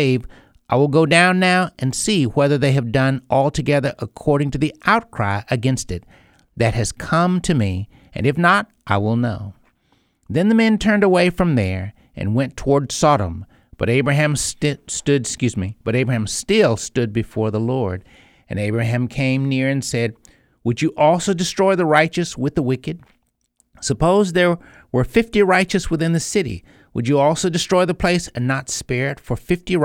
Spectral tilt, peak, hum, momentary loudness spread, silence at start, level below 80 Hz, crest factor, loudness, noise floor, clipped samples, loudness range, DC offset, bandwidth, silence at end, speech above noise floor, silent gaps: -5.5 dB/octave; 0 dBFS; none; 10 LU; 0 s; -42 dBFS; 18 dB; -18 LUFS; -64 dBFS; under 0.1%; 3 LU; under 0.1%; 16.5 kHz; 0 s; 46 dB; none